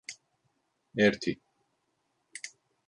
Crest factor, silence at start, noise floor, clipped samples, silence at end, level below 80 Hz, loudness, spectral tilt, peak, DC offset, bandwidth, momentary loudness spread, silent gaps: 24 dB; 0.1 s; -77 dBFS; under 0.1%; 0.4 s; -68 dBFS; -29 LUFS; -4.5 dB/octave; -12 dBFS; under 0.1%; 11 kHz; 21 LU; none